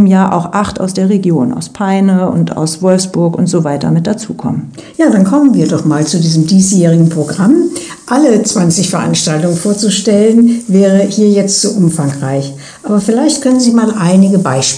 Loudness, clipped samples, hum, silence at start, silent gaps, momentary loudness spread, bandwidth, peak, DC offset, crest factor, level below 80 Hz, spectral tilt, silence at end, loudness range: -10 LUFS; 0.4%; none; 0 s; none; 8 LU; 10 kHz; 0 dBFS; under 0.1%; 10 dB; -48 dBFS; -5.5 dB/octave; 0 s; 3 LU